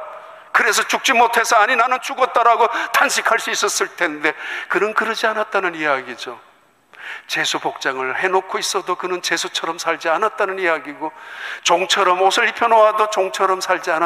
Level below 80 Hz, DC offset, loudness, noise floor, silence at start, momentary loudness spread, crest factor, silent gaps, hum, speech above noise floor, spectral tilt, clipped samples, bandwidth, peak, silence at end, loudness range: -70 dBFS; under 0.1%; -17 LUFS; -51 dBFS; 0 s; 12 LU; 16 dB; none; none; 33 dB; -1 dB/octave; under 0.1%; 15.5 kHz; -2 dBFS; 0 s; 6 LU